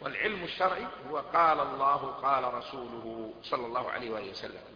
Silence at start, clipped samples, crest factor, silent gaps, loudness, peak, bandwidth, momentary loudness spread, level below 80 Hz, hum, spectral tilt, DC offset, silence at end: 0 s; under 0.1%; 20 dB; none; -31 LUFS; -12 dBFS; 5.2 kHz; 14 LU; -64 dBFS; none; -5.5 dB/octave; under 0.1%; 0 s